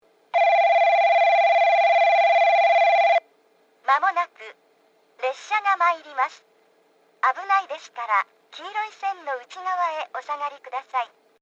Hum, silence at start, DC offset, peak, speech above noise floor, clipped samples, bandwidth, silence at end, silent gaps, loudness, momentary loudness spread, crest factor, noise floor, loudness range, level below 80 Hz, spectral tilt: none; 0.35 s; under 0.1%; -8 dBFS; 34 dB; under 0.1%; 7.6 kHz; 0.35 s; none; -21 LUFS; 14 LU; 14 dB; -61 dBFS; 10 LU; under -90 dBFS; 1 dB/octave